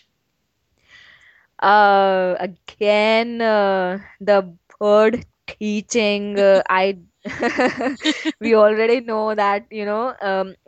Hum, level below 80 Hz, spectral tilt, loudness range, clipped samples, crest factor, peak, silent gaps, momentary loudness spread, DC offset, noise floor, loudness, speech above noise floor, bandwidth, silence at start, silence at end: none; -60 dBFS; -4.5 dB/octave; 2 LU; under 0.1%; 16 dB; -2 dBFS; none; 11 LU; under 0.1%; -71 dBFS; -18 LUFS; 53 dB; 8.6 kHz; 1.6 s; 0.15 s